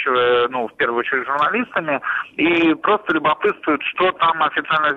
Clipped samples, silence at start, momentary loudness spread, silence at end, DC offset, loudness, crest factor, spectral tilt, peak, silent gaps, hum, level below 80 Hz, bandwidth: under 0.1%; 0 s; 5 LU; 0 s; under 0.1%; -18 LUFS; 12 dB; -6.5 dB/octave; -6 dBFS; none; none; -60 dBFS; 6.2 kHz